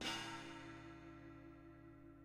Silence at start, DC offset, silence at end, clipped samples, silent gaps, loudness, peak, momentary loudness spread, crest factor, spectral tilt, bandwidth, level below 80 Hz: 0 s; under 0.1%; 0 s; under 0.1%; none; -53 LUFS; -32 dBFS; 14 LU; 20 dB; -3 dB/octave; 15.5 kHz; -70 dBFS